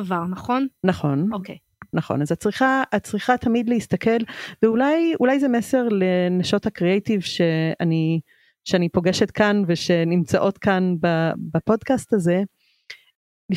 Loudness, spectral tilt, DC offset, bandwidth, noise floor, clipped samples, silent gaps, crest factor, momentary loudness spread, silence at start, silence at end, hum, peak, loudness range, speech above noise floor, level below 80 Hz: -21 LUFS; -6.5 dB/octave; under 0.1%; 13.5 kHz; -45 dBFS; under 0.1%; 13.15-13.49 s; 18 dB; 6 LU; 0 s; 0 s; none; -4 dBFS; 2 LU; 25 dB; -56 dBFS